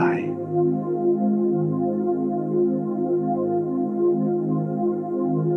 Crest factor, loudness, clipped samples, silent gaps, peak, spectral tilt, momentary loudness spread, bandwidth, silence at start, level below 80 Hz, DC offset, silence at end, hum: 14 dB; -23 LUFS; under 0.1%; none; -8 dBFS; -11.5 dB/octave; 3 LU; 3 kHz; 0 s; -76 dBFS; under 0.1%; 0 s; none